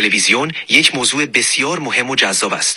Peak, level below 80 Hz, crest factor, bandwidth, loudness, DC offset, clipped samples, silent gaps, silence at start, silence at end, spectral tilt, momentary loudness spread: 0 dBFS; -62 dBFS; 16 dB; 17.5 kHz; -13 LUFS; under 0.1%; under 0.1%; none; 0 s; 0 s; -1 dB/octave; 5 LU